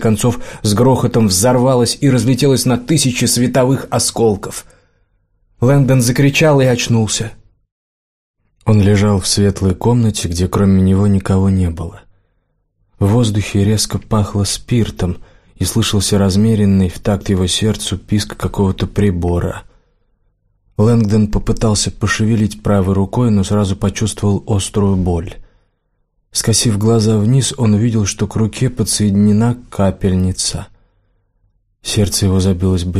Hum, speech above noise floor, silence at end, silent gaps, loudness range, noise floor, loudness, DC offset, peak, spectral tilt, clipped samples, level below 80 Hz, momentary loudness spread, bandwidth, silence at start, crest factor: none; 51 dB; 0 s; 7.72-8.34 s; 4 LU; -64 dBFS; -14 LUFS; 0.4%; -2 dBFS; -5.5 dB/octave; under 0.1%; -34 dBFS; 7 LU; 15 kHz; 0 s; 12 dB